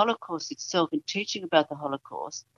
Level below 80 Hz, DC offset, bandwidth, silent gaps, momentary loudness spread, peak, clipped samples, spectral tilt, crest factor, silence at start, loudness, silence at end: -78 dBFS; under 0.1%; 7.4 kHz; none; 10 LU; -6 dBFS; under 0.1%; -3.5 dB/octave; 22 dB; 0 s; -29 LUFS; 0.15 s